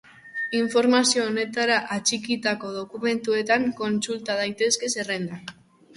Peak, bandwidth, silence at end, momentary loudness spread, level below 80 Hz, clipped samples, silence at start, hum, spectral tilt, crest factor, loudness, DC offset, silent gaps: -6 dBFS; 11.5 kHz; 0.45 s; 11 LU; -68 dBFS; under 0.1%; 0.25 s; none; -2.5 dB/octave; 18 dB; -24 LUFS; under 0.1%; none